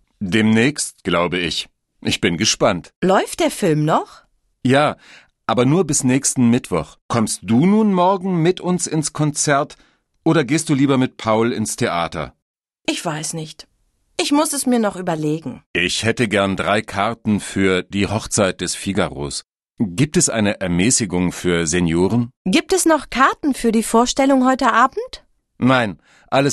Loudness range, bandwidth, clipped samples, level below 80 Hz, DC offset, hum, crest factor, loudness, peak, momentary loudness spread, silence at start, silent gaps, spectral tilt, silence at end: 4 LU; 13 kHz; under 0.1%; -46 dBFS; under 0.1%; none; 18 dB; -18 LUFS; -2 dBFS; 9 LU; 0.2 s; 2.96-3.02 s, 7.01-7.09 s, 12.42-12.55 s, 15.66-15.74 s, 22.36-22.45 s; -4.5 dB/octave; 0 s